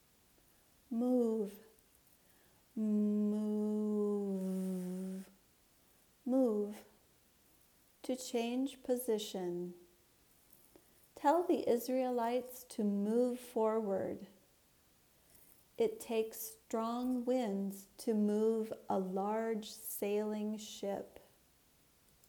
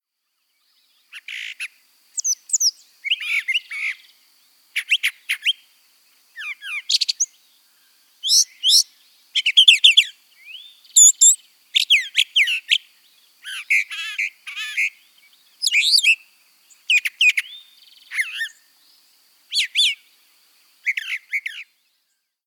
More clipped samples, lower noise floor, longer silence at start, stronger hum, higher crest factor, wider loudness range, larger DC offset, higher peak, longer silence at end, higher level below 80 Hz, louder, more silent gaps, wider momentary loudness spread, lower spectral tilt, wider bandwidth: neither; second, -70 dBFS vs -74 dBFS; second, 0.9 s vs 1.15 s; neither; about the same, 18 dB vs 22 dB; second, 5 LU vs 11 LU; neither; second, -20 dBFS vs 0 dBFS; first, 1.2 s vs 0.85 s; about the same, -78 dBFS vs -82 dBFS; second, -37 LUFS vs -17 LUFS; neither; second, 11 LU vs 21 LU; first, -6 dB/octave vs 9.5 dB/octave; about the same, over 20 kHz vs over 20 kHz